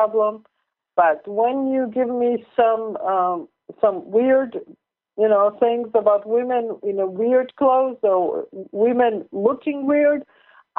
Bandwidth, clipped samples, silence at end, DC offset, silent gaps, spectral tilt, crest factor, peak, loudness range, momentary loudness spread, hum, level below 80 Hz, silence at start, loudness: 3.9 kHz; under 0.1%; 0.55 s; under 0.1%; none; -4.5 dB/octave; 16 dB; -4 dBFS; 2 LU; 8 LU; none; -70 dBFS; 0 s; -20 LUFS